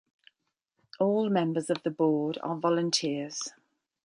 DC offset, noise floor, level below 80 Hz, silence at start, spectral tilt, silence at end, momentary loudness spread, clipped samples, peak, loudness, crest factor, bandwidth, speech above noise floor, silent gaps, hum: under 0.1%; -81 dBFS; -78 dBFS; 1 s; -5 dB/octave; 0.55 s; 8 LU; under 0.1%; -12 dBFS; -29 LUFS; 18 dB; 11.5 kHz; 53 dB; none; none